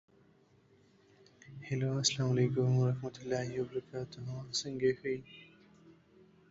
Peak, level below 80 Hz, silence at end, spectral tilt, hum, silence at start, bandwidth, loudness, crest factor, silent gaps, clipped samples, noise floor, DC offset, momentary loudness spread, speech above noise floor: -16 dBFS; -70 dBFS; 0.6 s; -5 dB/octave; none; 1.45 s; 8 kHz; -34 LUFS; 20 dB; none; under 0.1%; -66 dBFS; under 0.1%; 13 LU; 32 dB